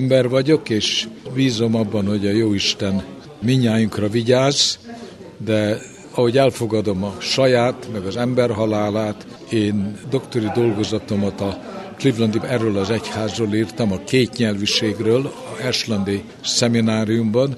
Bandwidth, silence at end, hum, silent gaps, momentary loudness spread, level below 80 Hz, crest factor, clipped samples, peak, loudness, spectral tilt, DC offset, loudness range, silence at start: 12.5 kHz; 0 s; none; none; 10 LU; -54 dBFS; 18 dB; under 0.1%; -2 dBFS; -19 LUFS; -5 dB/octave; under 0.1%; 3 LU; 0 s